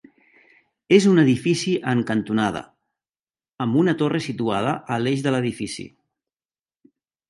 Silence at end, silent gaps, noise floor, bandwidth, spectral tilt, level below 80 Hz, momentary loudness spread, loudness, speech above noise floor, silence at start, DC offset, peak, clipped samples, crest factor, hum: 1.4 s; 3.54-3.58 s; under -90 dBFS; 11.5 kHz; -6 dB/octave; -60 dBFS; 13 LU; -21 LUFS; over 70 dB; 0.9 s; under 0.1%; -2 dBFS; under 0.1%; 20 dB; none